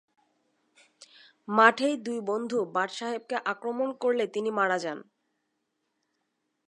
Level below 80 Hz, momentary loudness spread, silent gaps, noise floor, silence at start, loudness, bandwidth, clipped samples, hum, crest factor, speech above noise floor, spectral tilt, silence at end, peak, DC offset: -86 dBFS; 12 LU; none; -79 dBFS; 1.5 s; -27 LUFS; 11 kHz; under 0.1%; none; 26 dB; 52 dB; -4 dB/octave; 1.65 s; -4 dBFS; under 0.1%